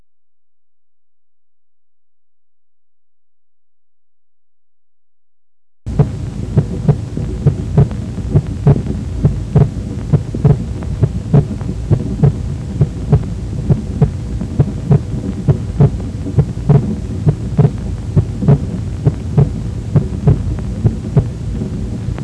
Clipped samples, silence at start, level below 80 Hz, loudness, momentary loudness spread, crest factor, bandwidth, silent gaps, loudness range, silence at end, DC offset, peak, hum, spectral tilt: under 0.1%; 5.85 s; -26 dBFS; -16 LUFS; 8 LU; 14 dB; 9.2 kHz; none; 4 LU; 0 s; under 0.1%; -2 dBFS; none; -9.5 dB/octave